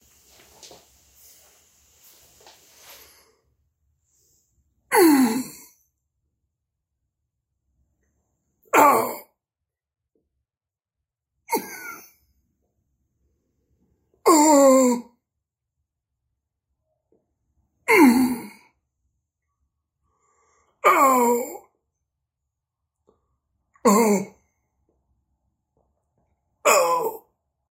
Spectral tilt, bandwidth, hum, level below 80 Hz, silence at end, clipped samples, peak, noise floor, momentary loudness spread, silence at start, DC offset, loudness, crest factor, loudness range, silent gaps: -3.5 dB/octave; 16 kHz; none; -70 dBFS; 0.55 s; under 0.1%; -2 dBFS; under -90 dBFS; 18 LU; 4.9 s; under 0.1%; -19 LUFS; 24 dB; 15 LU; none